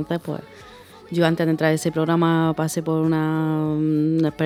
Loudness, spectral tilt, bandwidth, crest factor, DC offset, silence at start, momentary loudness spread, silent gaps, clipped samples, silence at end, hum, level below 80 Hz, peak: -21 LUFS; -6.5 dB/octave; 15 kHz; 18 dB; under 0.1%; 0 s; 8 LU; none; under 0.1%; 0 s; none; -58 dBFS; -4 dBFS